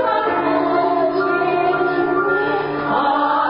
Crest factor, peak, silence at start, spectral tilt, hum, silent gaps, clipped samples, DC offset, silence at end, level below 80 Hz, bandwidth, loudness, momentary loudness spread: 12 dB; -6 dBFS; 0 s; -10.5 dB/octave; none; none; under 0.1%; under 0.1%; 0 s; -54 dBFS; 5.4 kHz; -18 LUFS; 2 LU